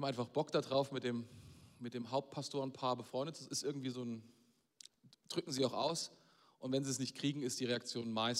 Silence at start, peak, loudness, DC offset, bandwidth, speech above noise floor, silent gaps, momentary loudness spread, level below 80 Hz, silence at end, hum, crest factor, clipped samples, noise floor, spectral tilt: 0 s; -22 dBFS; -40 LUFS; under 0.1%; 16 kHz; 24 dB; none; 14 LU; -82 dBFS; 0 s; none; 18 dB; under 0.1%; -64 dBFS; -4.5 dB/octave